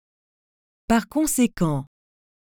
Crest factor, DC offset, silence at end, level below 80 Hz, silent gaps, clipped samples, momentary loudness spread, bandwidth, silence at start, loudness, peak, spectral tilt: 18 dB; under 0.1%; 0.75 s; -48 dBFS; none; under 0.1%; 9 LU; over 20 kHz; 0.9 s; -23 LUFS; -6 dBFS; -5 dB/octave